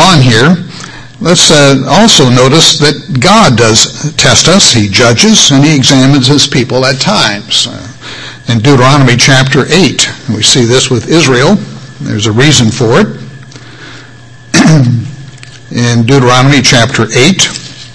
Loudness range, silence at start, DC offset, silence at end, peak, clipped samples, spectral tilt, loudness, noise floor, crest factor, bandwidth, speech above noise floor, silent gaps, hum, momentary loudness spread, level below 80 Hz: 5 LU; 0 s; under 0.1%; 0 s; 0 dBFS; 6%; -4 dB/octave; -5 LUFS; -32 dBFS; 6 dB; 11 kHz; 26 dB; none; none; 12 LU; -34 dBFS